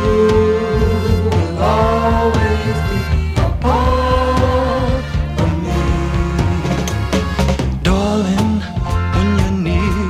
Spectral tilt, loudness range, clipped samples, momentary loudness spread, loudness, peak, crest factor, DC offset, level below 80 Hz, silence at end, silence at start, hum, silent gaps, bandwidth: -7 dB/octave; 2 LU; under 0.1%; 4 LU; -16 LUFS; 0 dBFS; 14 dB; under 0.1%; -22 dBFS; 0 s; 0 s; none; none; 14 kHz